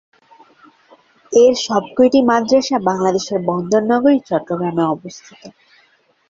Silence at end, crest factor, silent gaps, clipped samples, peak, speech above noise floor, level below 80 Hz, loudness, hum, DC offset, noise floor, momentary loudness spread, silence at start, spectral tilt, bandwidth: 0.8 s; 16 dB; none; under 0.1%; -2 dBFS; 41 dB; -60 dBFS; -16 LUFS; none; under 0.1%; -57 dBFS; 8 LU; 1.3 s; -5 dB/octave; 7.8 kHz